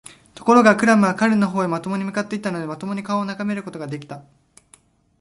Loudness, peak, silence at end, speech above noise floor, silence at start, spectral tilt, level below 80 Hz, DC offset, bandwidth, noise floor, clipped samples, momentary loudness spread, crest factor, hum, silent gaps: -19 LUFS; 0 dBFS; 1 s; 36 dB; 0.4 s; -6 dB/octave; -62 dBFS; under 0.1%; 11.5 kHz; -55 dBFS; under 0.1%; 17 LU; 20 dB; none; none